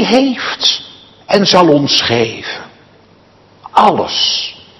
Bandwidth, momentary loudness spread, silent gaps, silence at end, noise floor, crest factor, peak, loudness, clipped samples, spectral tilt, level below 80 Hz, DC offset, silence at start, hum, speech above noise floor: 12 kHz; 11 LU; none; 0.25 s; -46 dBFS; 14 dB; 0 dBFS; -11 LUFS; 0.5%; -4 dB/octave; -52 dBFS; under 0.1%; 0 s; none; 34 dB